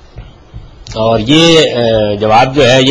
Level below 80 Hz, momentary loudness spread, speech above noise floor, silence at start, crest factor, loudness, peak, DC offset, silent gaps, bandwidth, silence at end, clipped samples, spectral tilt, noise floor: -34 dBFS; 7 LU; 24 dB; 0.15 s; 10 dB; -8 LUFS; 0 dBFS; 1%; none; 11 kHz; 0 s; 0.2%; -4.5 dB/octave; -32 dBFS